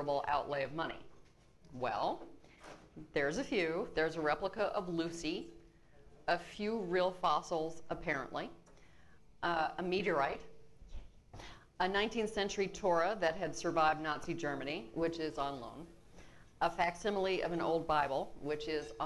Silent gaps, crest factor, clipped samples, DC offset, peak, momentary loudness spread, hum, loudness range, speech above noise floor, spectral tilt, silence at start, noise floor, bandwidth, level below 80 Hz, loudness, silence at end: none; 18 dB; under 0.1%; under 0.1%; -20 dBFS; 20 LU; none; 4 LU; 28 dB; -4.5 dB/octave; 0 s; -64 dBFS; 12 kHz; -60 dBFS; -36 LUFS; 0 s